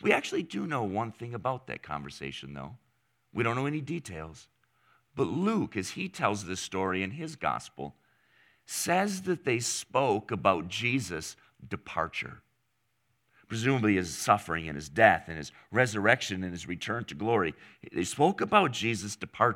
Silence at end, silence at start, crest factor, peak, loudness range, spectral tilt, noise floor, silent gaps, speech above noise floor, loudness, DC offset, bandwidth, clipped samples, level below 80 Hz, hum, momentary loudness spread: 0 s; 0 s; 26 dB; -4 dBFS; 8 LU; -4.5 dB/octave; -77 dBFS; none; 47 dB; -30 LUFS; under 0.1%; 17 kHz; under 0.1%; -62 dBFS; none; 15 LU